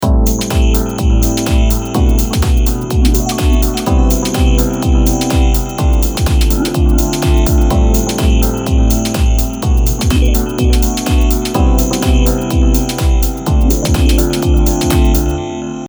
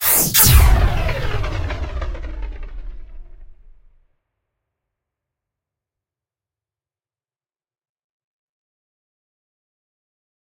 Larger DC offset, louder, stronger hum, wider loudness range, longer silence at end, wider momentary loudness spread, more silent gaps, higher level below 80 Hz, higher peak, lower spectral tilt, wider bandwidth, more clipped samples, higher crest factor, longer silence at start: neither; about the same, -13 LUFS vs -15 LUFS; neither; second, 1 LU vs 24 LU; second, 0 s vs 6.9 s; second, 2 LU vs 23 LU; neither; first, -12 dBFS vs -24 dBFS; about the same, 0 dBFS vs 0 dBFS; first, -5.5 dB/octave vs -3 dB/octave; first, over 20 kHz vs 16.5 kHz; neither; second, 10 dB vs 22 dB; about the same, 0 s vs 0 s